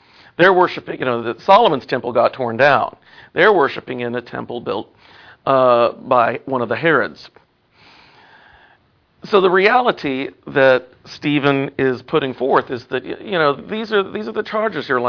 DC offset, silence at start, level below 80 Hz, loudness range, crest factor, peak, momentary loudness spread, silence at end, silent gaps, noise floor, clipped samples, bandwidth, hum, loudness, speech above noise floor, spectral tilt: under 0.1%; 0.4 s; -60 dBFS; 4 LU; 18 dB; 0 dBFS; 13 LU; 0 s; none; -57 dBFS; under 0.1%; 5.4 kHz; none; -17 LUFS; 40 dB; -7 dB/octave